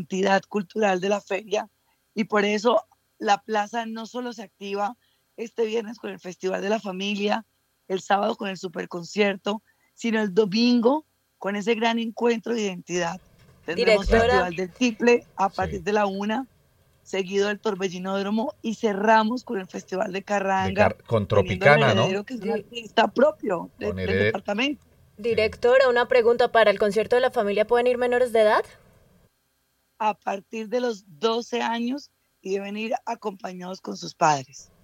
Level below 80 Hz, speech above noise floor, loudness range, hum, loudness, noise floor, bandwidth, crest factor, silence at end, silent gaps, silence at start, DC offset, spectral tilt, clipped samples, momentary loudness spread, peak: -48 dBFS; 47 dB; 7 LU; none; -24 LUFS; -70 dBFS; 14.5 kHz; 22 dB; 0.2 s; none; 0 s; under 0.1%; -5 dB/octave; under 0.1%; 13 LU; -2 dBFS